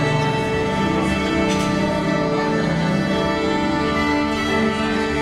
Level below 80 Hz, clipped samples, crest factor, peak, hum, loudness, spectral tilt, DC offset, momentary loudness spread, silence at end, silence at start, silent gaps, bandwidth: -38 dBFS; under 0.1%; 12 dB; -6 dBFS; none; -20 LUFS; -5.5 dB/octave; under 0.1%; 1 LU; 0 s; 0 s; none; 14 kHz